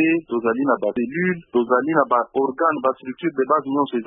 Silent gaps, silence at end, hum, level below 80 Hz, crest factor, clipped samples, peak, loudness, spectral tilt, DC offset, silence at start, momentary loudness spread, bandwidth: none; 0 s; none; -66 dBFS; 16 dB; under 0.1%; -4 dBFS; -21 LUFS; -11.5 dB/octave; under 0.1%; 0 s; 5 LU; 3.8 kHz